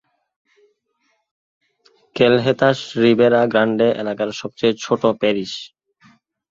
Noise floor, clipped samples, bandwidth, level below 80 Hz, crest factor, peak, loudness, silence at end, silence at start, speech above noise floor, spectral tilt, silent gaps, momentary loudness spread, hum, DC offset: -68 dBFS; under 0.1%; 7.6 kHz; -60 dBFS; 18 dB; -2 dBFS; -17 LUFS; 0.85 s; 2.15 s; 51 dB; -6 dB/octave; none; 11 LU; none; under 0.1%